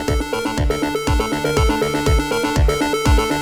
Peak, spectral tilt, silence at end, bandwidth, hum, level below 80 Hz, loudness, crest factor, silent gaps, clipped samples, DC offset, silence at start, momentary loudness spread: -4 dBFS; -5 dB/octave; 0 s; 18.5 kHz; none; -22 dBFS; -18 LUFS; 14 dB; none; under 0.1%; under 0.1%; 0 s; 4 LU